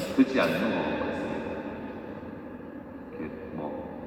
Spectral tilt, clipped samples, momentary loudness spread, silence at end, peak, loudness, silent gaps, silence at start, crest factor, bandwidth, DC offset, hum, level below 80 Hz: -6 dB/octave; under 0.1%; 17 LU; 0 s; -10 dBFS; -30 LUFS; none; 0 s; 22 dB; 14.5 kHz; under 0.1%; none; -58 dBFS